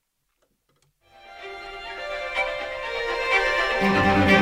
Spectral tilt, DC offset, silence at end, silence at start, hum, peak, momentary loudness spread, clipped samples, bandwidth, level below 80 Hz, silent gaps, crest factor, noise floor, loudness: -5 dB/octave; under 0.1%; 0 s; 1.25 s; none; -4 dBFS; 18 LU; under 0.1%; 15.5 kHz; -46 dBFS; none; 20 dB; -72 dBFS; -23 LUFS